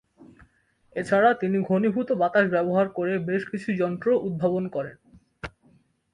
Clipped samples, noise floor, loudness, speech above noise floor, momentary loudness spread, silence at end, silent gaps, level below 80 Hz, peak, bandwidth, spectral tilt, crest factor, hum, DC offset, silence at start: under 0.1%; -62 dBFS; -24 LUFS; 39 dB; 16 LU; 0.65 s; none; -60 dBFS; -8 dBFS; 10.5 kHz; -8 dB/octave; 18 dB; none; under 0.1%; 0.2 s